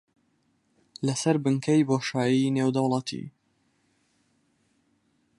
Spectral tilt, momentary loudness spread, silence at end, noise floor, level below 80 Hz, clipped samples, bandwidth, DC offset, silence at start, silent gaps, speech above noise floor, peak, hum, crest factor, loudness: -6 dB/octave; 11 LU; 2.1 s; -70 dBFS; -72 dBFS; under 0.1%; 11.5 kHz; under 0.1%; 1 s; none; 45 dB; -10 dBFS; none; 20 dB; -25 LUFS